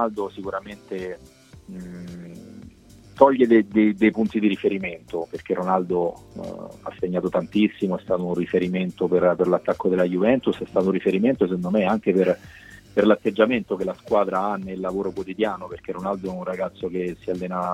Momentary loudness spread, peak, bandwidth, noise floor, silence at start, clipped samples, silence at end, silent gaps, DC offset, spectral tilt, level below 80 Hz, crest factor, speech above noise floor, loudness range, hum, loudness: 16 LU; -2 dBFS; 12 kHz; -48 dBFS; 0 s; under 0.1%; 0 s; none; under 0.1%; -8 dB/octave; -56 dBFS; 22 dB; 25 dB; 5 LU; none; -23 LUFS